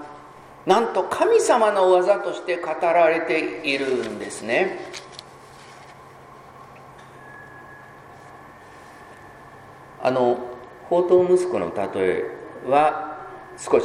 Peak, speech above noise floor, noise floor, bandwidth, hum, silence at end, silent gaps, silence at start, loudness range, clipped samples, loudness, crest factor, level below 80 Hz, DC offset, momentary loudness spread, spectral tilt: -2 dBFS; 25 dB; -45 dBFS; 12.5 kHz; none; 0 s; none; 0 s; 23 LU; under 0.1%; -21 LUFS; 20 dB; -62 dBFS; under 0.1%; 25 LU; -4.5 dB/octave